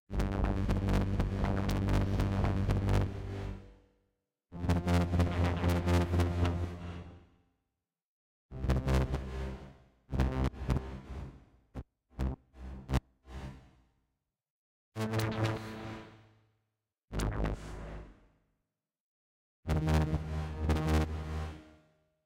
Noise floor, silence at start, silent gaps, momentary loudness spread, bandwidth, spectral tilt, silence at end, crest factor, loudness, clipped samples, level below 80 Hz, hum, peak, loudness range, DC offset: -87 dBFS; 0.1 s; 8.05-8.49 s, 14.50-14.92 s, 19.00-19.63 s; 18 LU; 16.5 kHz; -7 dB/octave; 0.55 s; 18 dB; -34 LUFS; under 0.1%; -40 dBFS; none; -16 dBFS; 10 LU; under 0.1%